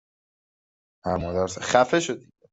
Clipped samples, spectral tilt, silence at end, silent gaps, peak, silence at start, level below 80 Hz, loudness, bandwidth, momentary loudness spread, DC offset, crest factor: under 0.1%; -4 dB/octave; 0.35 s; none; -4 dBFS; 1.05 s; -56 dBFS; -24 LUFS; 8.2 kHz; 13 LU; under 0.1%; 24 dB